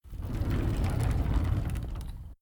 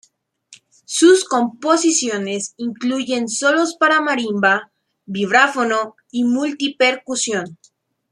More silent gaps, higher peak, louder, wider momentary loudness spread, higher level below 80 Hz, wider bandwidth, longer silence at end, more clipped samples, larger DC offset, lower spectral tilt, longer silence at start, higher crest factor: neither; second, -16 dBFS vs -2 dBFS; second, -32 LUFS vs -17 LUFS; about the same, 10 LU vs 10 LU; first, -34 dBFS vs -70 dBFS; first, over 20 kHz vs 12 kHz; second, 0.1 s vs 0.6 s; neither; neither; first, -7.5 dB/octave vs -2.5 dB/octave; second, 0.05 s vs 0.5 s; about the same, 14 dB vs 16 dB